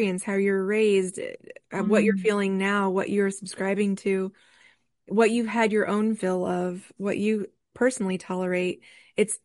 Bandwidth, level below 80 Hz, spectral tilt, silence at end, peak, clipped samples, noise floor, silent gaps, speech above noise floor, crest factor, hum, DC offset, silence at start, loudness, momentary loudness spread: 11.5 kHz; -70 dBFS; -5.5 dB/octave; 0.1 s; -8 dBFS; under 0.1%; -61 dBFS; none; 36 dB; 16 dB; none; under 0.1%; 0 s; -25 LUFS; 11 LU